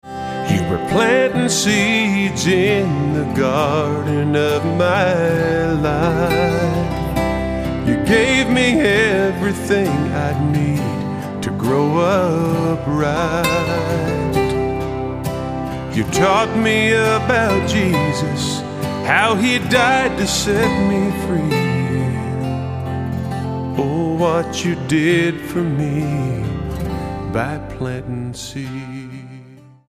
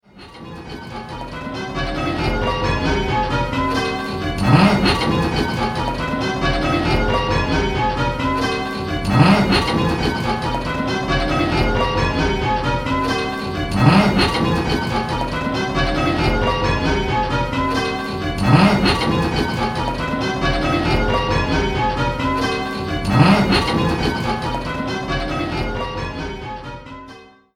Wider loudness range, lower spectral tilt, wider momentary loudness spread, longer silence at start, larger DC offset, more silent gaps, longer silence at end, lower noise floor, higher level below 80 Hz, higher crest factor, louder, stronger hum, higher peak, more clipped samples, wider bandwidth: about the same, 4 LU vs 3 LU; about the same, -5.5 dB/octave vs -6 dB/octave; about the same, 10 LU vs 11 LU; about the same, 0.05 s vs 0.15 s; neither; neither; about the same, 0.3 s vs 0.3 s; about the same, -41 dBFS vs -42 dBFS; second, -36 dBFS vs -30 dBFS; about the same, 18 dB vs 18 dB; about the same, -17 LUFS vs -19 LUFS; neither; about the same, 0 dBFS vs 0 dBFS; neither; about the same, 15.5 kHz vs 15 kHz